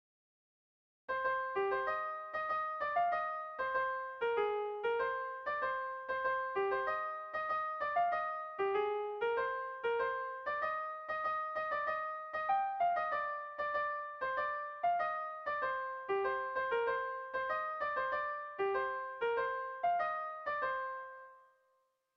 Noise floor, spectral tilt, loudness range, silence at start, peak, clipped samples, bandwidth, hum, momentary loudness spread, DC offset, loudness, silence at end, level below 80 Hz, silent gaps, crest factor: -78 dBFS; -5.5 dB/octave; 1 LU; 1.1 s; -22 dBFS; under 0.1%; 6.4 kHz; none; 5 LU; under 0.1%; -37 LUFS; 0.75 s; -74 dBFS; none; 14 dB